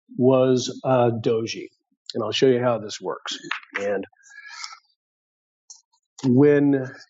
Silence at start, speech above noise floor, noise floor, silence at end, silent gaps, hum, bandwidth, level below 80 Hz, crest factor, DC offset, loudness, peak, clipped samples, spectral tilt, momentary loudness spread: 0.1 s; over 69 dB; under -90 dBFS; 0.05 s; 1.97-2.05 s, 4.96-5.68 s, 5.85-5.91 s, 6.06-6.16 s; none; 7.8 kHz; -78 dBFS; 16 dB; under 0.1%; -22 LUFS; -6 dBFS; under 0.1%; -5.5 dB/octave; 19 LU